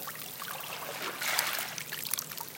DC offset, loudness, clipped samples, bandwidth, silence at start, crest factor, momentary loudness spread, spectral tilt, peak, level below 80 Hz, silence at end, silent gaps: under 0.1%; -33 LUFS; under 0.1%; 17 kHz; 0 s; 30 dB; 9 LU; -0.5 dB/octave; -6 dBFS; -78 dBFS; 0 s; none